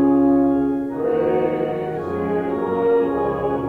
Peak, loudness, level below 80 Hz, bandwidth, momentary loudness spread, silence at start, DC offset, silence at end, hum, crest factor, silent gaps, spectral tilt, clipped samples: -6 dBFS; -20 LUFS; -46 dBFS; 4 kHz; 7 LU; 0 s; under 0.1%; 0 s; none; 12 dB; none; -9.5 dB/octave; under 0.1%